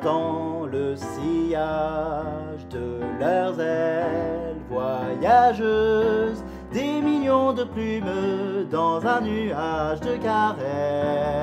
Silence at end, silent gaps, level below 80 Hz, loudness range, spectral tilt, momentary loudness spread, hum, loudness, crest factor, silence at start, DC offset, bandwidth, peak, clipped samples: 0 s; none; -46 dBFS; 5 LU; -7 dB/octave; 9 LU; none; -24 LUFS; 18 dB; 0 s; under 0.1%; 14 kHz; -6 dBFS; under 0.1%